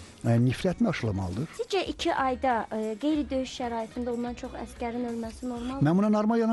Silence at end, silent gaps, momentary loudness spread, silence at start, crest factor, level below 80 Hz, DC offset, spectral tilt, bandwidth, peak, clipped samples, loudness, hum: 0 s; none; 10 LU; 0 s; 14 dB; -50 dBFS; under 0.1%; -6.5 dB/octave; 12 kHz; -14 dBFS; under 0.1%; -29 LUFS; none